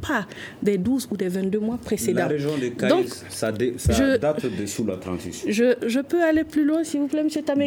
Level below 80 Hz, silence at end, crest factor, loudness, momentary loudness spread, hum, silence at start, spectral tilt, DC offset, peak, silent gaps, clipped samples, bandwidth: -42 dBFS; 0 s; 16 dB; -23 LUFS; 7 LU; none; 0 s; -5.5 dB/octave; under 0.1%; -8 dBFS; none; under 0.1%; 19.5 kHz